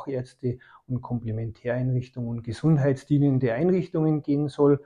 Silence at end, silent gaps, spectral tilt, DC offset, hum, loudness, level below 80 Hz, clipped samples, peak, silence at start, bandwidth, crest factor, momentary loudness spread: 0.05 s; none; -9.5 dB/octave; under 0.1%; none; -26 LUFS; -54 dBFS; under 0.1%; -10 dBFS; 0 s; 10 kHz; 16 dB; 11 LU